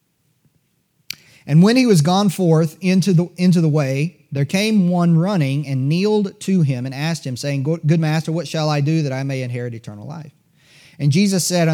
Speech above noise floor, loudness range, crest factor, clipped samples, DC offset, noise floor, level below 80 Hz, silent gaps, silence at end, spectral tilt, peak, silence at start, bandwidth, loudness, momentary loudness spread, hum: 48 dB; 5 LU; 16 dB; under 0.1%; under 0.1%; -64 dBFS; -70 dBFS; none; 0 s; -6.5 dB/octave; -2 dBFS; 1.45 s; 16.5 kHz; -17 LUFS; 13 LU; none